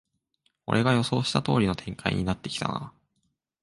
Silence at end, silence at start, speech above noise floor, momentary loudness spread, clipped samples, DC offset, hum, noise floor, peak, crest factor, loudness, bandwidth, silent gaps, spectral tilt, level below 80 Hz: 0.7 s; 0.7 s; 50 dB; 11 LU; under 0.1%; under 0.1%; none; -76 dBFS; -6 dBFS; 22 dB; -27 LUFS; 11.5 kHz; none; -5.5 dB/octave; -50 dBFS